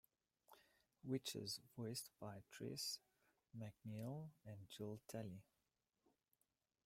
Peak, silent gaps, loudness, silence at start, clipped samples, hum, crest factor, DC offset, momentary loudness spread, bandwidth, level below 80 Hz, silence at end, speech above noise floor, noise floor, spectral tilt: -32 dBFS; none; -52 LUFS; 0.5 s; under 0.1%; none; 22 dB; under 0.1%; 11 LU; 16 kHz; -86 dBFS; 1.45 s; over 38 dB; under -90 dBFS; -4.5 dB/octave